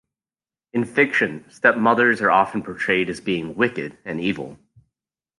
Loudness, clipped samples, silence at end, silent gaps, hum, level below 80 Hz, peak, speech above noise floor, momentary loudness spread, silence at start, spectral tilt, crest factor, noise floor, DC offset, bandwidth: -20 LUFS; under 0.1%; 0.85 s; none; none; -60 dBFS; -2 dBFS; over 69 dB; 12 LU; 0.75 s; -5.5 dB/octave; 20 dB; under -90 dBFS; under 0.1%; 11.5 kHz